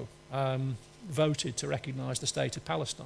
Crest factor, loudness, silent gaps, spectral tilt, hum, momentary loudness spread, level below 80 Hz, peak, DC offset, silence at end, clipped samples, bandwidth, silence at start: 20 dB; -33 LUFS; none; -4.5 dB/octave; none; 8 LU; -62 dBFS; -14 dBFS; under 0.1%; 0 s; under 0.1%; 11 kHz; 0 s